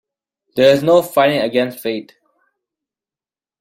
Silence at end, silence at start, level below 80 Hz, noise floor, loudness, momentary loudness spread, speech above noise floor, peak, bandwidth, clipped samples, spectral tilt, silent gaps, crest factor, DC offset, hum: 1.6 s; 0.55 s; -60 dBFS; under -90 dBFS; -15 LUFS; 13 LU; over 76 dB; -2 dBFS; 16.5 kHz; under 0.1%; -5 dB/octave; none; 16 dB; under 0.1%; none